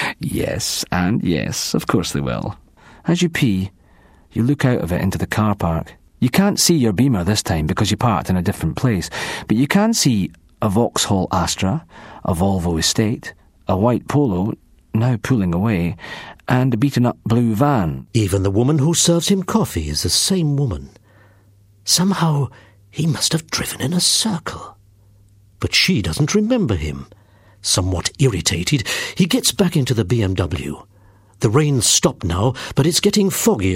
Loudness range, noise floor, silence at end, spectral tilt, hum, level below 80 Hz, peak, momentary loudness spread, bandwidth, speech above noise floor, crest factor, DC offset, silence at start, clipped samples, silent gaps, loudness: 3 LU; -51 dBFS; 0 s; -4.5 dB/octave; none; -40 dBFS; 0 dBFS; 11 LU; 16 kHz; 33 dB; 18 dB; under 0.1%; 0 s; under 0.1%; none; -18 LUFS